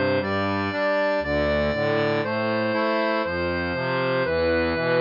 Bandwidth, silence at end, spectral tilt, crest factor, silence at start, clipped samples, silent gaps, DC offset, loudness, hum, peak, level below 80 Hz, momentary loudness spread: 5.6 kHz; 0 s; -7.5 dB/octave; 12 dB; 0 s; under 0.1%; none; under 0.1%; -23 LUFS; none; -10 dBFS; -46 dBFS; 2 LU